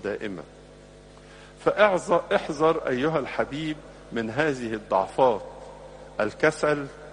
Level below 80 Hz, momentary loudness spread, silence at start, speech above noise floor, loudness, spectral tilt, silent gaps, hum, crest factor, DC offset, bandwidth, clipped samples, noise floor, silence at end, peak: -54 dBFS; 16 LU; 0 s; 23 dB; -25 LUFS; -5.5 dB/octave; none; 50 Hz at -50 dBFS; 22 dB; under 0.1%; 10.5 kHz; under 0.1%; -48 dBFS; 0 s; -4 dBFS